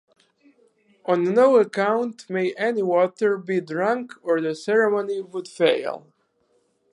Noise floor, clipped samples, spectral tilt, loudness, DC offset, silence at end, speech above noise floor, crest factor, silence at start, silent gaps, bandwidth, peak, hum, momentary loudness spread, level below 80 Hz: -67 dBFS; under 0.1%; -6 dB/octave; -22 LUFS; under 0.1%; 0.95 s; 45 dB; 18 dB; 1.05 s; none; 11 kHz; -6 dBFS; none; 11 LU; -80 dBFS